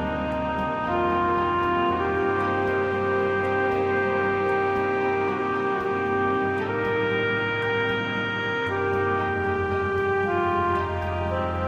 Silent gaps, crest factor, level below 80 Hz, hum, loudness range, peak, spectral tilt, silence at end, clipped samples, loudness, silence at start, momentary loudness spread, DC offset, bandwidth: none; 12 dB; -46 dBFS; none; 1 LU; -12 dBFS; -7 dB/octave; 0 s; under 0.1%; -24 LUFS; 0 s; 3 LU; under 0.1%; 7.6 kHz